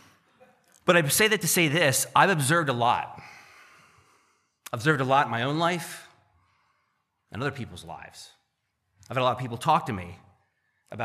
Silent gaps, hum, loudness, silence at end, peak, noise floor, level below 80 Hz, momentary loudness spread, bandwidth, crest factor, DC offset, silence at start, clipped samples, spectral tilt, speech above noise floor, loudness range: none; none; -24 LUFS; 0 s; -4 dBFS; -77 dBFS; -66 dBFS; 21 LU; 15 kHz; 24 dB; under 0.1%; 0.85 s; under 0.1%; -3.5 dB/octave; 52 dB; 11 LU